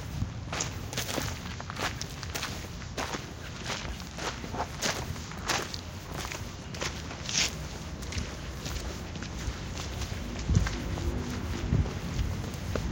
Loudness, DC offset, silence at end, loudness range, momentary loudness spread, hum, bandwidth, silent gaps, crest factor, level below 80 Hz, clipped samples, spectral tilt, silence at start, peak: -34 LUFS; under 0.1%; 0 s; 3 LU; 9 LU; none; 17 kHz; none; 22 dB; -40 dBFS; under 0.1%; -4 dB/octave; 0 s; -10 dBFS